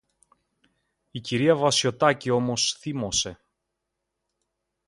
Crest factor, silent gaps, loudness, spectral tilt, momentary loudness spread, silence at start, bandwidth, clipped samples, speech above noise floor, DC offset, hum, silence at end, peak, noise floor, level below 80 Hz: 22 dB; none; -23 LUFS; -3.5 dB/octave; 11 LU; 1.15 s; 11.5 kHz; under 0.1%; 58 dB; under 0.1%; none; 1.55 s; -6 dBFS; -82 dBFS; -58 dBFS